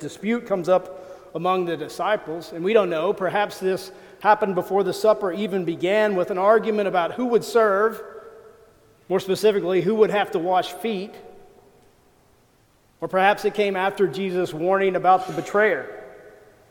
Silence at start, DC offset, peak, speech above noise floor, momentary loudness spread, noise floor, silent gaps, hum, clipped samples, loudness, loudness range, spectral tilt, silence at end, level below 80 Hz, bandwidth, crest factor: 0 s; under 0.1%; -4 dBFS; 38 dB; 10 LU; -59 dBFS; none; none; under 0.1%; -22 LUFS; 4 LU; -5.5 dB/octave; 0.4 s; -64 dBFS; 19 kHz; 20 dB